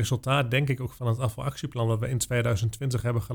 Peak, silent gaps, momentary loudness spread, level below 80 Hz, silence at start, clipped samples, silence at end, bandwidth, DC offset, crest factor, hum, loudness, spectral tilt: -10 dBFS; none; 5 LU; -48 dBFS; 0 s; under 0.1%; 0 s; 18.5 kHz; under 0.1%; 16 dB; none; -27 LUFS; -5.5 dB/octave